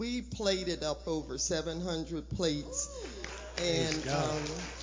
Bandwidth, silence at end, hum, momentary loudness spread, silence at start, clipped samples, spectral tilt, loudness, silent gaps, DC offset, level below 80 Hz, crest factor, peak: 7.8 kHz; 0 s; none; 7 LU; 0 s; under 0.1%; -4 dB/octave; -34 LUFS; none; under 0.1%; -48 dBFS; 18 dB; -16 dBFS